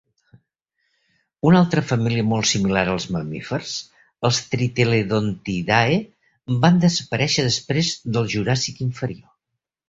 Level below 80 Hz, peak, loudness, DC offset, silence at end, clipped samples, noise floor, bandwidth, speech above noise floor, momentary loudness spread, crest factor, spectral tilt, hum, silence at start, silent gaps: -50 dBFS; -2 dBFS; -20 LUFS; under 0.1%; 0.7 s; under 0.1%; -82 dBFS; 8 kHz; 62 dB; 10 LU; 20 dB; -5 dB/octave; none; 1.45 s; none